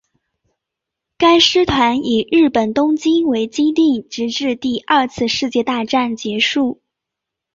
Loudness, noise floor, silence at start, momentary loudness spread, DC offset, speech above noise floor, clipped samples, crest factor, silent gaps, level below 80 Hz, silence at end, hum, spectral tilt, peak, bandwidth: -16 LUFS; -82 dBFS; 1.2 s; 8 LU; under 0.1%; 67 dB; under 0.1%; 16 dB; none; -46 dBFS; 0.8 s; none; -4 dB/octave; 0 dBFS; 7.6 kHz